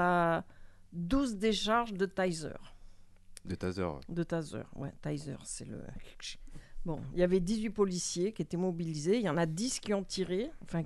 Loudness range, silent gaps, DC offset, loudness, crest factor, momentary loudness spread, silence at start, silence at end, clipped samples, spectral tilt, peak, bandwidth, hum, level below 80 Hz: 7 LU; none; under 0.1%; -34 LUFS; 18 dB; 15 LU; 0 s; 0 s; under 0.1%; -5 dB/octave; -16 dBFS; 12.5 kHz; none; -52 dBFS